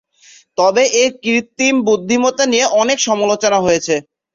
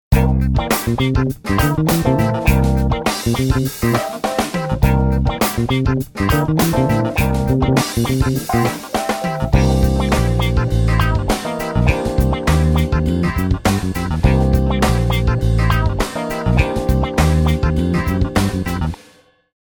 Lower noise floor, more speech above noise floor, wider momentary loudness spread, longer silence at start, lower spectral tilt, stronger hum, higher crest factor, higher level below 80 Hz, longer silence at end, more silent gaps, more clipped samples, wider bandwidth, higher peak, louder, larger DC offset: about the same, -47 dBFS vs -50 dBFS; about the same, 33 dB vs 34 dB; about the same, 5 LU vs 5 LU; first, 0.6 s vs 0.1 s; second, -2.5 dB/octave vs -6 dB/octave; neither; about the same, 14 dB vs 16 dB; second, -54 dBFS vs -22 dBFS; second, 0.35 s vs 0.75 s; neither; neither; second, 7.8 kHz vs over 20 kHz; about the same, 0 dBFS vs 0 dBFS; first, -14 LUFS vs -17 LUFS; neither